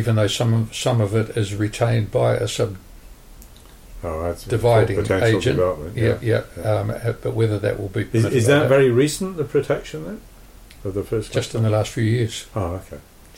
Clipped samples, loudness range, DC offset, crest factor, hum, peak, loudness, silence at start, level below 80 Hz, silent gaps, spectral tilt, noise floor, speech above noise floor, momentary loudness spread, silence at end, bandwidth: under 0.1%; 5 LU; under 0.1%; 16 dB; none; -6 dBFS; -21 LUFS; 0 s; -42 dBFS; none; -6 dB/octave; -43 dBFS; 24 dB; 12 LU; 0.35 s; 16 kHz